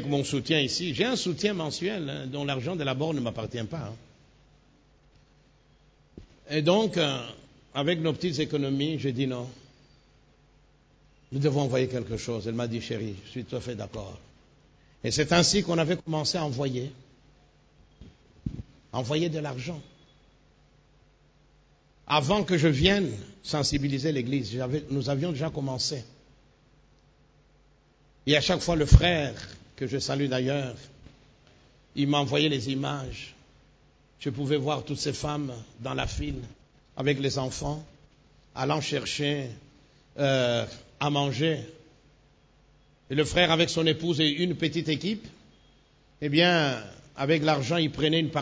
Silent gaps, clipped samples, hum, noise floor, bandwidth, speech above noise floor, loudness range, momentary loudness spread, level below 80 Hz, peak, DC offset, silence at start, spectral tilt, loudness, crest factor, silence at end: none; under 0.1%; none; -61 dBFS; 8 kHz; 34 dB; 8 LU; 16 LU; -42 dBFS; 0 dBFS; under 0.1%; 0 s; -5 dB/octave; -27 LUFS; 28 dB; 0 s